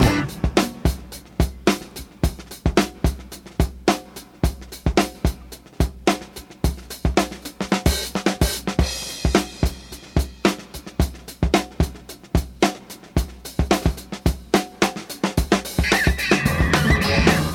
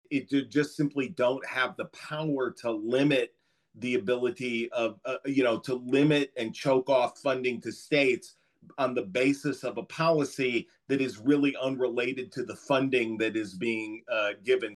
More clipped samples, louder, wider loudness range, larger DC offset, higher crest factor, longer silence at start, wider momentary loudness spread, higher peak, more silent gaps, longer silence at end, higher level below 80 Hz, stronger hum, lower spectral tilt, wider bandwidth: neither; first, -22 LUFS vs -29 LUFS; about the same, 4 LU vs 2 LU; neither; about the same, 20 dB vs 16 dB; about the same, 0 s vs 0.1 s; about the same, 10 LU vs 9 LU; first, -2 dBFS vs -12 dBFS; neither; about the same, 0 s vs 0 s; first, -28 dBFS vs -78 dBFS; neither; about the same, -5 dB/octave vs -5.5 dB/octave; first, 18 kHz vs 12.5 kHz